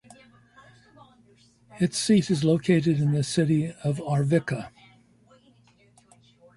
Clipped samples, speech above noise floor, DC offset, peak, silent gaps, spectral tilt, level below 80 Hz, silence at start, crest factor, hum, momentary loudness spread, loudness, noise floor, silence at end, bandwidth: under 0.1%; 36 dB; under 0.1%; -8 dBFS; none; -6 dB/octave; -62 dBFS; 1.75 s; 18 dB; none; 8 LU; -24 LUFS; -59 dBFS; 1.9 s; 11.5 kHz